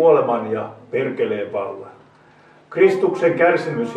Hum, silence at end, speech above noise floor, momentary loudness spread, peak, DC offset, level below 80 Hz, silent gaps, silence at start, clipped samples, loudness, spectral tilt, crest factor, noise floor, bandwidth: none; 0 s; 32 dB; 12 LU; -2 dBFS; under 0.1%; -68 dBFS; none; 0 s; under 0.1%; -19 LUFS; -7 dB/octave; 16 dB; -50 dBFS; 9.4 kHz